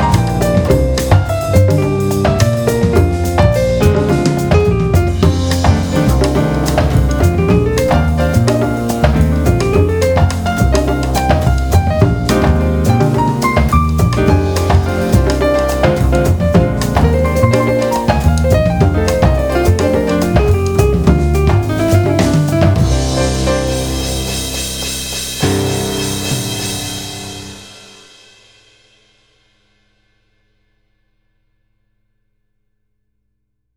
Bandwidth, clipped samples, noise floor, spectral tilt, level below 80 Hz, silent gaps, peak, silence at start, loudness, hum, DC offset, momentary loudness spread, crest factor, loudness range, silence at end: over 20 kHz; under 0.1%; -69 dBFS; -6 dB/octave; -20 dBFS; none; 0 dBFS; 0 s; -13 LUFS; none; under 0.1%; 5 LU; 12 dB; 5 LU; 6 s